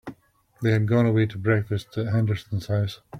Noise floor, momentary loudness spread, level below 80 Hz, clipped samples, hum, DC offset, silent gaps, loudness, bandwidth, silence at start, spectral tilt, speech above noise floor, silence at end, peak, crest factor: -53 dBFS; 8 LU; -56 dBFS; under 0.1%; none; under 0.1%; none; -24 LUFS; 9.6 kHz; 0.05 s; -8 dB/octave; 30 dB; 0 s; -8 dBFS; 16 dB